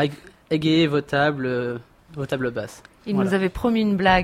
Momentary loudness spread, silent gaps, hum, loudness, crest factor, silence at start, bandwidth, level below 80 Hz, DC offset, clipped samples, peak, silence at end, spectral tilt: 15 LU; none; none; -22 LUFS; 16 dB; 0 s; 14.5 kHz; -44 dBFS; under 0.1%; under 0.1%; -6 dBFS; 0 s; -6.5 dB/octave